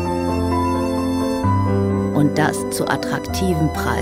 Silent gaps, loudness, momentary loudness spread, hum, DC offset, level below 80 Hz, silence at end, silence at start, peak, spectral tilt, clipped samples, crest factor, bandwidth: none; -19 LUFS; 3 LU; none; under 0.1%; -36 dBFS; 0 s; 0 s; -2 dBFS; -6 dB/octave; under 0.1%; 16 dB; 16 kHz